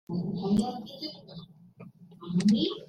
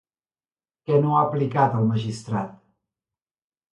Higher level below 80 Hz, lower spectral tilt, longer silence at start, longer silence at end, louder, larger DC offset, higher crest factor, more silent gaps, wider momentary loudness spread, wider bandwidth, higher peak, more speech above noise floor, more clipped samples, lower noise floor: about the same, -60 dBFS vs -62 dBFS; second, -6.5 dB/octave vs -8 dB/octave; second, 0.1 s vs 0.9 s; second, 0.05 s vs 1.2 s; second, -29 LUFS vs -22 LUFS; neither; about the same, 16 dB vs 18 dB; neither; first, 22 LU vs 10 LU; about the same, 10.5 kHz vs 11 kHz; second, -14 dBFS vs -6 dBFS; second, 22 dB vs over 68 dB; neither; second, -51 dBFS vs under -90 dBFS